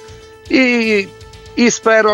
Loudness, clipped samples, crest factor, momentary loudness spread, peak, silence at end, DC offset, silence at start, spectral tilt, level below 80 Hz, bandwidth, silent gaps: -13 LUFS; under 0.1%; 14 dB; 11 LU; 0 dBFS; 0 s; under 0.1%; 0 s; -3.5 dB/octave; -46 dBFS; 11.5 kHz; none